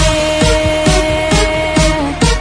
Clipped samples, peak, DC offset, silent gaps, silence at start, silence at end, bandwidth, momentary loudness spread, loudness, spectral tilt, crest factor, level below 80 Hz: under 0.1%; 0 dBFS; under 0.1%; none; 0 s; 0 s; 10.5 kHz; 2 LU; -12 LUFS; -4.5 dB/octave; 12 dB; -18 dBFS